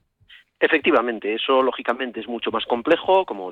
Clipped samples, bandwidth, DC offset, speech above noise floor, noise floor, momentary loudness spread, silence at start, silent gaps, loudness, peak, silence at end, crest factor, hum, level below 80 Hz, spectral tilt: under 0.1%; 6 kHz; under 0.1%; 31 dB; -52 dBFS; 8 LU; 0.6 s; none; -21 LUFS; -6 dBFS; 0 s; 16 dB; none; -62 dBFS; -5.5 dB/octave